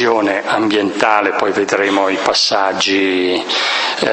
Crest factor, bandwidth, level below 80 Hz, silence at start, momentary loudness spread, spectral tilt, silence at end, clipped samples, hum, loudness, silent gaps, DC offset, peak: 14 dB; 8.8 kHz; -58 dBFS; 0 s; 3 LU; -2.5 dB/octave; 0 s; under 0.1%; none; -14 LUFS; none; under 0.1%; 0 dBFS